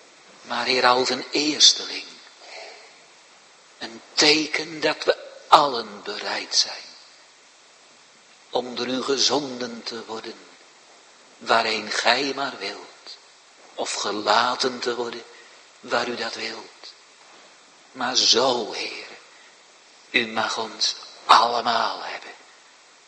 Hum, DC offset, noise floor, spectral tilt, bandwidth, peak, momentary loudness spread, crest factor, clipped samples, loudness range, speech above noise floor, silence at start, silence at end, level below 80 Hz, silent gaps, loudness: none; under 0.1%; -52 dBFS; -1 dB/octave; 13 kHz; 0 dBFS; 22 LU; 26 dB; under 0.1%; 6 LU; 30 dB; 0.4 s; 0.7 s; -74 dBFS; none; -21 LUFS